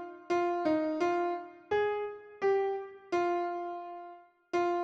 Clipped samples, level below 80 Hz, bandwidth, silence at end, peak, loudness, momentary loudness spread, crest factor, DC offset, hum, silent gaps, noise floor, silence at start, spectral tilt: under 0.1%; -72 dBFS; 7.6 kHz; 0 s; -18 dBFS; -33 LUFS; 11 LU; 14 dB; under 0.1%; none; none; -52 dBFS; 0 s; -5.5 dB/octave